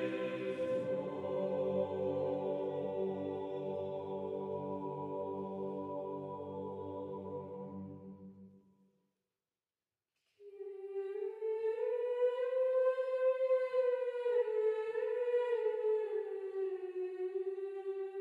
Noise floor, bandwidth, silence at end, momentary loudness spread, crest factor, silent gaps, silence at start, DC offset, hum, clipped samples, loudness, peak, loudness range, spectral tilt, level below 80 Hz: under -90 dBFS; 4.6 kHz; 0 s; 11 LU; 14 dB; none; 0 s; under 0.1%; none; under 0.1%; -37 LUFS; -22 dBFS; 14 LU; -8 dB/octave; -86 dBFS